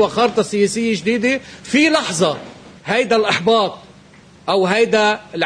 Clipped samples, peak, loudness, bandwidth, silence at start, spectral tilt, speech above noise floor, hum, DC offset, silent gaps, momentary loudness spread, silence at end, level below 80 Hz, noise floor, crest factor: under 0.1%; -2 dBFS; -16 LUFS; 10.5 kHz; 0 s; -4 dB/octave; 28 dB; none; under 0.1%; none; 8 LU; 0 s; -56 dBFS; -45 dBFS; 14 dB